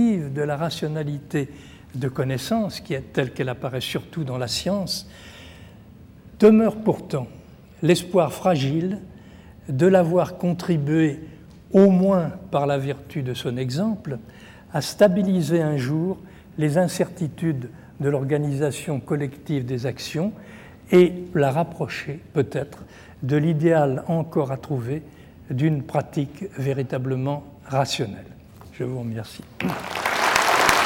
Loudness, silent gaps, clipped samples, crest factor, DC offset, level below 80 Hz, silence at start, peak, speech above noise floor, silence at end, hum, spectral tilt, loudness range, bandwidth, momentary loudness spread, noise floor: -23 LUFS; none; under 0.1%; 20 dB; under 0.1%; -54 dBFS; 0 s; -2 dBFS; 24 dB; 0 s; none; -6 dB/octave; 6 LU; 17 kHz; 15 LU; -46 dBFS